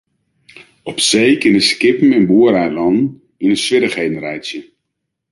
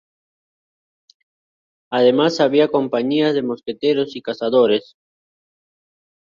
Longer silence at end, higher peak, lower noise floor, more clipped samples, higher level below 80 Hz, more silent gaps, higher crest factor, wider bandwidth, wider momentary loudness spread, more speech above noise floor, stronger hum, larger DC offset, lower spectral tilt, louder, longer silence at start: second, 0.7 s vs 1.5 s; about the same, 0 dBFS vs -2 dBFS; second, -75 dBFS vs under -90 dBFS; neither; first, -54 dBFS vs -66 dBFS; neither; about the same, 14 dB vs 18 dB; first, 11.5 kHz vs 7.4 kHz; first, 14 LU vs 9 LU; second, 62 dB vs over 73 dB; neither; neither; second, -4 dB/octave vs -6 dB/octave; first, -13 LUFS vs -18 LUFS; second, 0.85 s vs 1.9 s